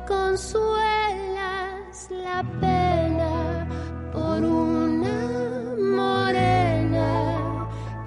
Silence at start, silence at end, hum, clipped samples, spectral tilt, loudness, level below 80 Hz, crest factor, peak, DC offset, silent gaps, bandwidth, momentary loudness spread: 0 s; 0 s; none; under 0.1%; -6.5 dB/octave; -24 LUFS; -40 dBFS; 14 dB; -10 dBFS; under 0.1%; none; 11.5 kHz; 10 LU